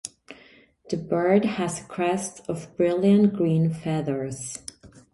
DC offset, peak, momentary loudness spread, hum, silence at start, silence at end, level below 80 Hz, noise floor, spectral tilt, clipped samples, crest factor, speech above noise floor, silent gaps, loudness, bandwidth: under 0.1%; -6 dBFS; 14 LU; none; 0.05 s; 0.15 s; -60 dBFS; -54 dBFS; -6.5 dB/octave; under 0.1%; 18 dB; 31 dB; none; -24 LUFS; 11.5 kHz